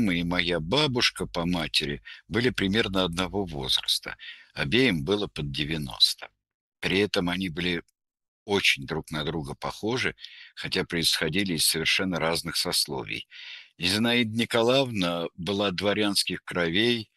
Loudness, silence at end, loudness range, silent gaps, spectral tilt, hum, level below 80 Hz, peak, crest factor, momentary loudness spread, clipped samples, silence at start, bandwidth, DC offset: -26 LUFS; 0.15 s; 2 LU; 6.54-6.72 s, 8.28-8.46 s; -3.5 dB/octave; none; -50 dBFS; -6 dBFS; 22 dB; 11 LU; under 0.1%; 0 s; 13 kHz; under 0.1%